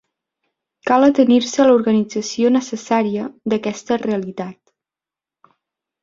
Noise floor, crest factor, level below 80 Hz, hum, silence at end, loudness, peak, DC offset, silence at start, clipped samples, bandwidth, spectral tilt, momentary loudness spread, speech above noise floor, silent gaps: -89 dBFS; 16 dB; -62 dBFS; none; 1.5 s; -17 LUFS; -2 dBFS; under 0.1%; 0.85 s; under 0.1%; 7.6 kHz; -5 dB/octave; 12 LU; 73 dB; none